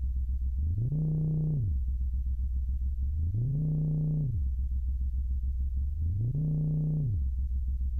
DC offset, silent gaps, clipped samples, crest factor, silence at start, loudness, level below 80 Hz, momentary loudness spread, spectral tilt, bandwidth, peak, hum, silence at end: under 0.1%; none; under 0.1%; 8 dB; 0 s; -32 LUFS; -32 dBFS; 4 LU; -13 dB/octave; 0.9 kHz; -22 dBFS; none; 0 s